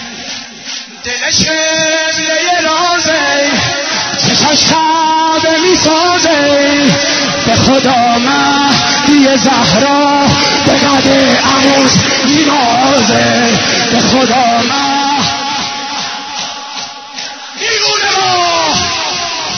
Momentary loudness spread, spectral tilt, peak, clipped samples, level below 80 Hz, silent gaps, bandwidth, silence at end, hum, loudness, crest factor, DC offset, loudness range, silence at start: 11 LU; -3 dB/octave; 0 dBFS; under 0.1%; -42 dBFS; none; 11 kHz; 0 s; none; -9 LUFS; 10 dB; under 0.1%; 5 LU; 0 s